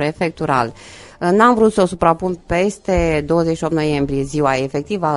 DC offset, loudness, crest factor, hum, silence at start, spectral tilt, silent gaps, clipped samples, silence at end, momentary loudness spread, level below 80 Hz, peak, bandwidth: under 0.1%; -17 LUFS; 16 dB; none; 0 s; -6.5 dB/octave; none; under 0.1%; 0 s; 8 LU; -36 dBFS; 0 dBFS; 11.5 kHz